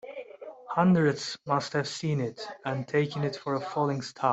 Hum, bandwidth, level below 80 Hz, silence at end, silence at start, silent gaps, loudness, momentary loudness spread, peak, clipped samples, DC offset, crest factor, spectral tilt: none; 8.2 kHz; -68 dBFS; 0 s; 0.05 s; none; -29 LUFS; 14 LU; -10 dBFS; under 0.1%; under 0.1%; 18 dB; -6 dB/octave